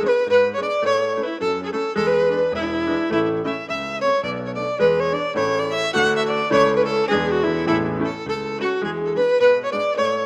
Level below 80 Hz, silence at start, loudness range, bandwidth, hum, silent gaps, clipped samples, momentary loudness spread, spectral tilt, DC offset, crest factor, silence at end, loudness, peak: -52 dBFS; 0 s; 2 LU; 10.5 kHz; none; none; under 0.1%; 8 LU; -5.5 dB/octave; under 0.1%; 16 dB; 0 s; -20 LUFS; -4 dBFS